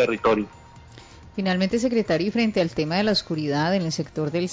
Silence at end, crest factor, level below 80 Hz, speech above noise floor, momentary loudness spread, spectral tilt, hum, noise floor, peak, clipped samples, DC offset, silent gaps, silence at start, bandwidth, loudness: 0 s; 12 dB; -52 dBFS; 23 dB; 6 LU; -5.5 dB/octave; none; -46 dBFS; -12 dBFS; under 0.1%; under 0.1%; none; 0 s; 8 kHz; -23 LUFS